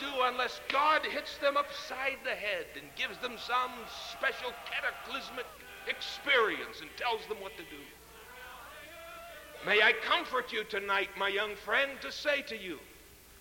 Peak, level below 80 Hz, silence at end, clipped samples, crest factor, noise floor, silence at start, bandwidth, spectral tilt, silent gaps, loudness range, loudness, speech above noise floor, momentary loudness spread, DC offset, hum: -14 dBFS; -64 dBFS; 0 s; under 0.1%; 20 dB; -55 dBFS; 0 s; 17 kHz; -2 dB/octave; none; 6 LU; -32 LUFS; 22 dB; 20 LU; under 0.1%; none